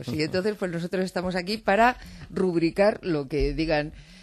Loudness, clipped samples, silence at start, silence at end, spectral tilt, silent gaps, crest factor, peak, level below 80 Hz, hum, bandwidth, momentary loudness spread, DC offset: -25 LUFS; under 0.1%; 0 s; 0.05 s; -6 dB/octave; none; 20 dB; -6 dBFS; -42 dBFS; none; 13 kHz; 8 LU; under 0.1%